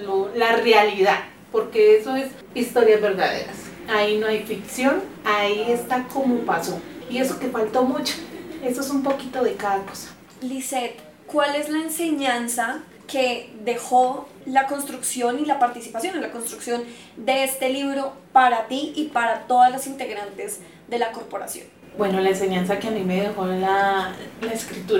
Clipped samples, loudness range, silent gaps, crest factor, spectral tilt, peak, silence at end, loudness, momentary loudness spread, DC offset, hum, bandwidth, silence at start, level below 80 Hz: under 0.1%; 5 LU; none; 20 dB; -3.5 dB/octave; -4 dBFS; 0 s; -22 LUFS; 14 LU; under 0.1%; none; 17.5 kHz; 0 s; -62 dBFS